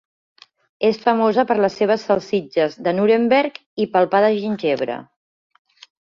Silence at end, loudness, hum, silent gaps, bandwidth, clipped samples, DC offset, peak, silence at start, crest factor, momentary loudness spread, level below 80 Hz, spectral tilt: 1 s; -19 LUFS; none; 3.66-3.77 s; 7.2 kHz; under 0.1%; under 0.1%; -2 dBFS; 0.8 s; 16 dB; 7 LU; -64 dBFS; -6.5 dB/octave